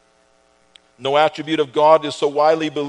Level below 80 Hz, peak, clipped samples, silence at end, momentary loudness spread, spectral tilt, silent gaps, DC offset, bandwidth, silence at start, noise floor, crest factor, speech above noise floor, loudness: -70 dBFS; 0 dBFS; under 0.1%; 0 s; 7 LU; -5 dB/octave; none; under 0.1%; 10.5 kHz; 1 s; -57 dBFS; 18 dB; 41 dB; -17 LUFS